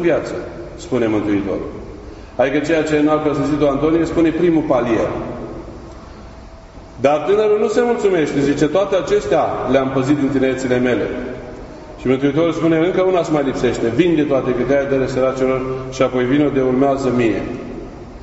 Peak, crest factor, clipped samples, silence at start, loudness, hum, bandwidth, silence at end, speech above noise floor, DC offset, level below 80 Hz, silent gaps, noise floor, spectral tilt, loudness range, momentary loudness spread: 0 dBFS; 16 dB; under 0.1%; 0 s; -17 LUFS; none; 8 kHz; 0 s; 21 dB; under 0.1%; -40 dBFS; none; -37 dBFS; -6.5 dB/octave; 3 LU; 16 LU